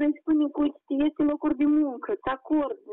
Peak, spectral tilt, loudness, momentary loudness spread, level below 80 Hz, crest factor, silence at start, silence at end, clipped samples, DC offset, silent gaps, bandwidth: -16 dBFS; -4.5 dB/octave; -26 LUFS; 6 LU; -58 dBFS; 10 dB; 0 s; 0 s; under 0.1%; under 0.1%; none; 3.8 kHz